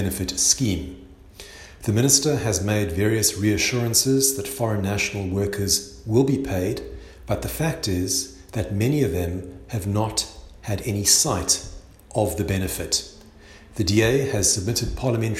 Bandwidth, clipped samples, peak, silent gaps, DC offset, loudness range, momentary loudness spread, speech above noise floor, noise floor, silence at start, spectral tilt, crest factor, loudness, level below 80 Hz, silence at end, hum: 16 kHz; under 0.1%; -2 dBFS; none; under 0.1%; 5 LU; 14 LU; 24 dB; -46 dBFS; 0 s; -3.5 dB/octave; 20 dB; -22 LUFS; -42 dBFS; 0 s; none